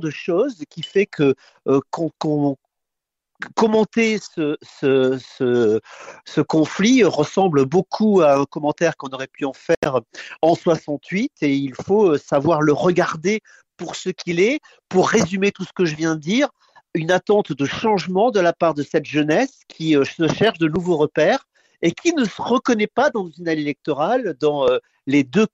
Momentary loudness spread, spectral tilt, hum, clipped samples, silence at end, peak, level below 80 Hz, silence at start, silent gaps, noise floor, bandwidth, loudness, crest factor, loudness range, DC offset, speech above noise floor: 9 LU; -5.5 dB/octave; none; under 0.1%; 0.05 s; -4 dBFS; -58 dBFS; 0 s; 9.77-9.82 s; -82 dBFS; 8 kHz; -19 LUFS; 14 dB; 4 LU; under 0.1%; 63 dB